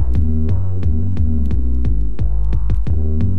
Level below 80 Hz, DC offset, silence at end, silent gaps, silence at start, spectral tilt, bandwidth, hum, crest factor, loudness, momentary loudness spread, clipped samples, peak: -18 dBFS; 20%; 0 s; none; 0 s; -10.5 dB/octave; 4.1 kHz; none; 10 dB; -20 LUFS; 3 LU; under 0.1%; -4 dBFS